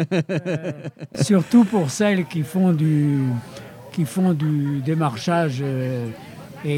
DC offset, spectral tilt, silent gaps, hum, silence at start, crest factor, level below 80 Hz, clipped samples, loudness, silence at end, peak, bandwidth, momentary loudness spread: under 0.1%; -7 dB/octave; none; none; 0 s; 16 dB; -64 dBFS; under 0.1%; -21 LUFS; 0 s; -4 dBFS; 16 kHz; 15 LU